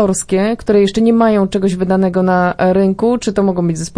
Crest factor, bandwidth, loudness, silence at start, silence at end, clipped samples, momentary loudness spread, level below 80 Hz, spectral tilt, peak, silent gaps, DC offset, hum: 12 dB; 10.5 kHz; -13 LUFS; 0 s; 0.1 s; under 0.1%; 4 LU; -40 dBFS; -6 dB/octave; 0 dBFS; none; under 0.1%; none